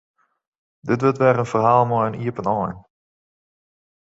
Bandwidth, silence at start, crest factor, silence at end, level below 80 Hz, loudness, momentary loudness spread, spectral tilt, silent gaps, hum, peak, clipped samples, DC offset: 8 kHz; 0.85 s; 20 dB; 1.3 s; -56 dBFS; -20 LUFS; 12 LU; -8 dB/octave; none; none; -2 dBFS; under 0.1%; under 0.1%